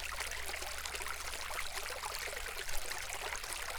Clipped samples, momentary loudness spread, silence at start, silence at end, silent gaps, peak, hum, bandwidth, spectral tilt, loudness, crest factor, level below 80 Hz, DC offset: under 0.1%; 1 LU; 0 s; 0 s; none; -18 dBFS; none; over 20 kHz; -0.5 dB/octave; -40 LUFS; 20 dB; -50 dBFS; under 0.1%